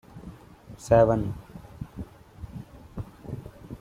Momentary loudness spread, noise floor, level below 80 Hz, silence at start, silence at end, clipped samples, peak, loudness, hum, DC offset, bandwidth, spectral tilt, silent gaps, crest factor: 25 LU; -47 dBFS; -46 dBFS; 0.15 s; 0.05 s; under 0.1%; -6 dBFS; -23 LUFS; none; under 0.1%; 13.5 kHz; -8 dB/octave; none; 22 dB